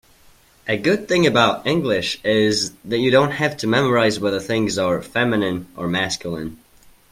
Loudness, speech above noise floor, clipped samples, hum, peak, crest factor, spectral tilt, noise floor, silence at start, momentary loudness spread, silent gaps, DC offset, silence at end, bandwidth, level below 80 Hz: -19 LUFS; 33 dB; under 0.1%; none; -2 dBFS; 18 dB; -4.5 dB/octave; -52 dBFS; 0.65 s; 9 LU; none; under 0.1%; 0.55 s; 16.5 kHz; -52 dBFS